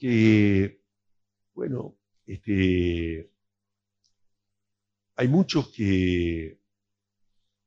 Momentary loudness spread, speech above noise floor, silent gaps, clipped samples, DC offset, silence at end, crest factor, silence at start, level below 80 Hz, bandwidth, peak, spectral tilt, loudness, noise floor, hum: 19 LU; 60 dB; none; under 0.1%; under 0.1%; 1.15 s; 20 dB; 0 s; -50 dBFS; 7.6 kHz; -6 dBFS; -7.5 dB/octave; -24 LUFS; -84 dBFS; none